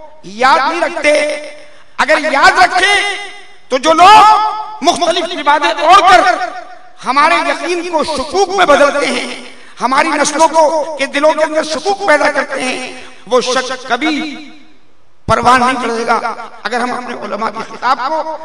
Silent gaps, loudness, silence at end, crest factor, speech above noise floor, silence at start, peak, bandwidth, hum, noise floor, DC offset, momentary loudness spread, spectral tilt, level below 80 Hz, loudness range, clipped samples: none; -11 LUFS; 0 s; 12 dB; 42 dB; 0 s; 0 dBFS; 12 kHz; none; -53 dBFS; 2%; 15 LU; -2.5 dB/octave; -46 dBFS; 6 LU; 1%